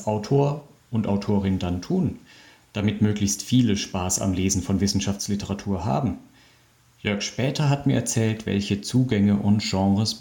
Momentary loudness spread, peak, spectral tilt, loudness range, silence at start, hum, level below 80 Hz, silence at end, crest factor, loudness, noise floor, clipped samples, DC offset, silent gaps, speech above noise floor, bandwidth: 7 LU; -8 dBFS; -5.5 dB/octave; 3 LU; 0 s; none; -52 dBFS; 0 s; 16 dB; -24 LUFS; -58 dBFS; under 0.1%; under 0.1%; none; 35 dB; 17.5 kHz